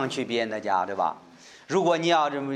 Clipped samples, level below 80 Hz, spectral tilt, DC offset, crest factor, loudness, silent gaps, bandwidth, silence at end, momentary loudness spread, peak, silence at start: under 0.1%; -76 dBFS; -4.5 dB/octave; under 0.1%; 18 dB; -25 LUFS; none; 11 kHz; 0 s; 7 LU; -8 dBFS; 0 s